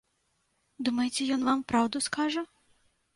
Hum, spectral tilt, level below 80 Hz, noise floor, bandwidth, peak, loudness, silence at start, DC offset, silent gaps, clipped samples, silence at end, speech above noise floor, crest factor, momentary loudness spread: none; -3 dB/octave; -66 dBFS; -75 dBFS; 11.5 kHz; -14 dBFS; -29 LUFS; 0.8 s; under 0.1%; none; under 0.1%; 0.7 s; 46 dB; 16 dB; 7 LU